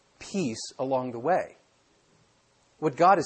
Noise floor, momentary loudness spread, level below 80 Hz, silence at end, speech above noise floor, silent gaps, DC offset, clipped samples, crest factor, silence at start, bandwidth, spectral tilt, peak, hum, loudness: -65 dBFS; 11 LU; -70 dBFS; 0 s; 40 dB; none; under 0.1%; under 0.1%; 20 dB; 0.2 s; 8.8 kHz; -5.5 dB/octave; -8 dBFS; none; -28 LUFS